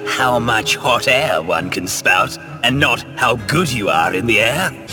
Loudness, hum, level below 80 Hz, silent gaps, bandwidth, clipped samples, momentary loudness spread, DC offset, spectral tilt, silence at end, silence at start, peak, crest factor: -15 LUFS; none; -44 dBFS; none; 18 kHz; under 0.1%; 5 LU; under 0.1%; -3.5 dB/octave; 0 s; 0 s; -2 dBFS; 16 dB